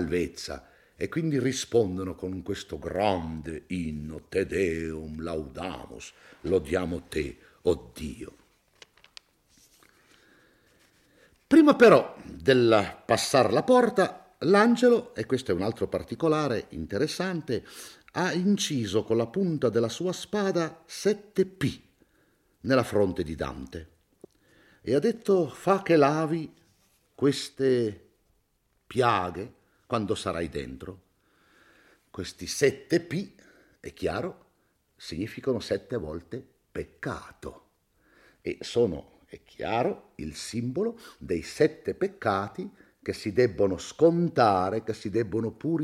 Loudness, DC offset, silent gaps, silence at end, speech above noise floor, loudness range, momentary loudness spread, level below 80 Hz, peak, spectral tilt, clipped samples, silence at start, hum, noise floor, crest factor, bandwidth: -27 LUFS; under 0.1%; none; 0 s; 45 dB; 11 LU; 17 LU; -56 dBFS; -6 dBFS; -5.5 dB/octave; under 0.1%; 0 s; none; -71 dBFS; 22 dB; 15.5 kHz